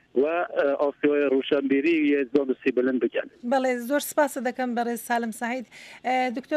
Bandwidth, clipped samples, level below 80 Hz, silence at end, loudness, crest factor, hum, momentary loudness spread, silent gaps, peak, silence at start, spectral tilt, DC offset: 15.5 kHz; under 0.1%; -72 dBFS; 0 s; -25 LUFS; 16 dB; none; 7 LU; none; -8 dBFS; 0.15 s; -4 dB/octave; under 0.1%